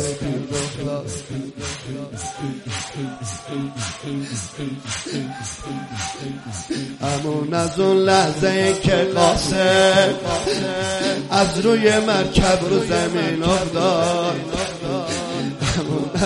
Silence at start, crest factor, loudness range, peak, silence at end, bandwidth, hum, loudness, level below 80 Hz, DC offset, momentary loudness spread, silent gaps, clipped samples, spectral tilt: 0 s; 18 dB; 11 LU; -2 dBFS; 0 s; 11.5 kHz; none; -20 LUFS; -40 dBFS; under 0.1%; 13 LU; none; under 0.1%; -4.5 dB/octave